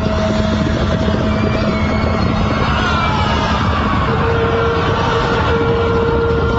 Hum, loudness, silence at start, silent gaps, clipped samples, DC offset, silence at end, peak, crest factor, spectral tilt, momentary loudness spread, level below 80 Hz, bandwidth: none; -15 LUFS; 0 s; none; under 0.1%; under 0.1%; 0 s; -2 dBFS; 12 dB; -5 dB/octave; 1 LU; -24 dBFS; 8 kHz